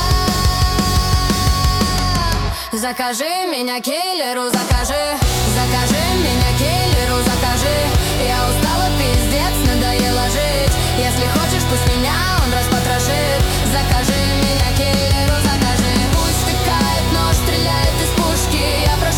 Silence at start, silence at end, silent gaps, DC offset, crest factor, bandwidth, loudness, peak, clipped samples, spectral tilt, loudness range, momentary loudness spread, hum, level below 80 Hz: 0 s; 0 s; none; under 0.1%; 12 dB; 18 kHz; -16 LUFS; -4 dBFS; under 0.1%; -4 dB/octave; 2 LU; 3 LU; none; -22 dBFS